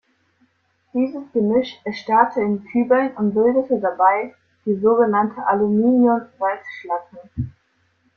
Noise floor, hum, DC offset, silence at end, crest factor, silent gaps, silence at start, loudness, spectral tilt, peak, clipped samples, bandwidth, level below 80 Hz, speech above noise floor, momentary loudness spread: -64 dBFS; none; under 0.1%; 0.65 s; 18 dB; none; 0.95 s; -19 LUFS; -8.5 dB/octave; -2 dBFS; under 0.1%; 6.4 kHz; -54 dBFS; 46 dB; 14 LU